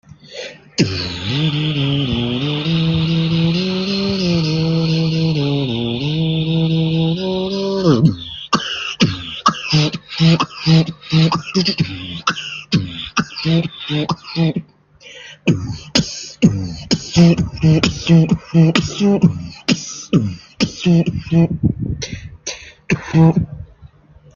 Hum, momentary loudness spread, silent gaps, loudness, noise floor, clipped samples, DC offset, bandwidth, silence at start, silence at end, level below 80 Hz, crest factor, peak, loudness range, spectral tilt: none; 10 LU; none; -17 LUFS; -44 dBFS; under 0.1%; under 0.1%; 7.2 kHz; 0.3 s; 0.5 s; -42 dBFS; 16 dB; 0 dBFS; 5 LU; -6 dB/octave